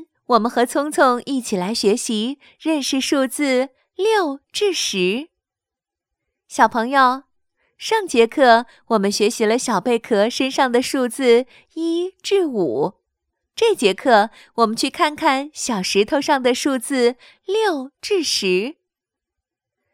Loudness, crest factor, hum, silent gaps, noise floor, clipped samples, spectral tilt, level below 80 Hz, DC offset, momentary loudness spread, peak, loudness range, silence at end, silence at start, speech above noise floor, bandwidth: -19 LUFS; 20 dB; none; none; -87 dBFS; under 0.1%; -3.5 dB/octave; -64 dBFS; under 0.1%; 8 LU; 0 dBFS; 3 LU; 1.2 s; 0 s; 69 dB; 16.5 kHz